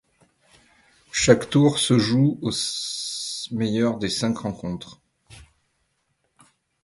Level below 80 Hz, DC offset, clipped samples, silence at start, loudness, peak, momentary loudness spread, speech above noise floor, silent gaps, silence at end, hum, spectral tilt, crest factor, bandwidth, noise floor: -54 dBFS; under 0.1%; under 0.1%; 1.15 s; -22 LUFS; -2 dBFS; 12 LU; 50 dB; none; 1.4 s; none; -4.5 dB/octave; 24 dB; 11.5 kHz; -72 dBFS